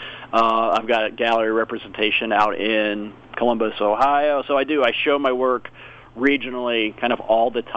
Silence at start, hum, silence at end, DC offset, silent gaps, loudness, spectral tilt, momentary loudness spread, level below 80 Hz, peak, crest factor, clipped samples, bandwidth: 0 s; none; 0 s; under 0.1%; none; -20 LUFS; -5.5 dB/octave; 6 LU; -54 dBFS; -4 dBFS; 16 dB; under 0.1%; 8.2 kHz